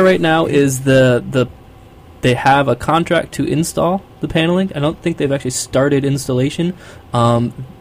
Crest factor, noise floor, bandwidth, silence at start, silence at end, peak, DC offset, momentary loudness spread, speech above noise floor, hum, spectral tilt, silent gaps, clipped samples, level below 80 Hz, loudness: 14 dB; -40 dBFS; 16 kHz; 0 s; 0.1 s; -2 dBFS; under 0.1%; 8 LU; 25 dB; none; -5.5 dB/octave; none; under 0.1%; -42 dBFS; -16 LUFS